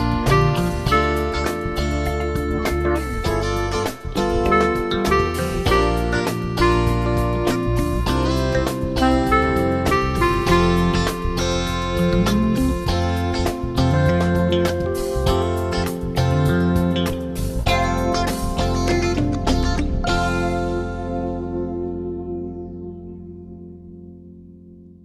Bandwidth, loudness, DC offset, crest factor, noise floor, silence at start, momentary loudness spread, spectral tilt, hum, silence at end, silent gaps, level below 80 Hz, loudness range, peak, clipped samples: 14 kHz; -20 LUFS; 0.2%; 18 dB; -43 dBFS; 0 s; 9 LU; -6 dB/octave; none; 0.15 s; none; -28 dBFS; 6 LU; -2 dBFS; under 0.1%